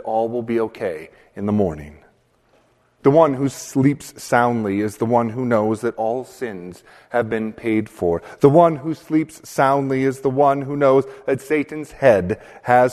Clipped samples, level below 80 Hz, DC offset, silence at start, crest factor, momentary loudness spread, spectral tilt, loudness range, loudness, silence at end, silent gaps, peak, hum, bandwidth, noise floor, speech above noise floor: under 0.1%; -52 dBFS; under 0.1%; 0.05 s; 18 dB; 12 LU; -7 dB/octave; 4 LU; -19 LUFS; 0 s; none; 0 dBFS; none; 13.5 kHz; -59 dBFS; 40 dB